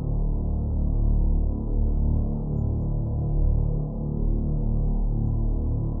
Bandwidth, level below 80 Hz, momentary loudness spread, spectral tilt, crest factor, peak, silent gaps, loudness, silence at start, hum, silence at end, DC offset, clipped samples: 1.3 kHz; -24 dBFS; 3 LU; -16 dB/octave; 10 dB; -12 dBFS; none; -27 LUFS; 0 s; none; 0 s; under 0.1%; under 0.1%